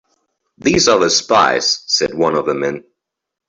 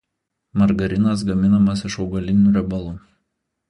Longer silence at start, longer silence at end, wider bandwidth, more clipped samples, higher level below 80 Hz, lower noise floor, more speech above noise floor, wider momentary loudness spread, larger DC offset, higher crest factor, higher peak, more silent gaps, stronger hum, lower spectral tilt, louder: about the same, 0.6 s vs 0.55 s; about the same, 0.7 s vs 0.7 s; second, 8.4 kHz vs 10.5 kHz; neither; second, -50 dBFS vs -40 dBFS; second, -73 dBFS vs -78 dBFS; about the same, 59 dB vs 60 dB; second, 9 LU vs 12 LU; neither; about the same, 16 dB vs 14 dB; first, 0 dBFS vs -4 dBFS; neither; neither; second, -2.5 dB/octave vs -7.5 dB/octave; first, -14 LUFS vs -19 LUFS